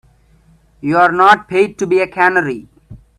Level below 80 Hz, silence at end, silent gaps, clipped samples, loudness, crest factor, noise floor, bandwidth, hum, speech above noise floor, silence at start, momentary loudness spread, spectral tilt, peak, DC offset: -50 dBFS; 0.2 s; none; under 0.1%; -13 LUFS; 14 dB; -50 dBFS; 11.5 kHz; none; 37 dB; 0.85 s; 13 LU; -5.5 dB/octave; 0 dBFS; under 0.1%